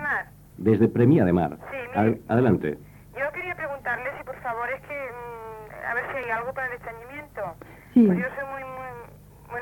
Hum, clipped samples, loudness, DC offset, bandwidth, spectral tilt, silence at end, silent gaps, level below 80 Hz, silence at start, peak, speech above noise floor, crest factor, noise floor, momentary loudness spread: none; under 0.1%; -25 LUFS; under 0.1%; 18 kHz; -9 dB/octave; 0 s; none; -54 dBFS; 0 s; -6 dBFS; 24 dB; 20 dB; -47 dBFS; 19 LU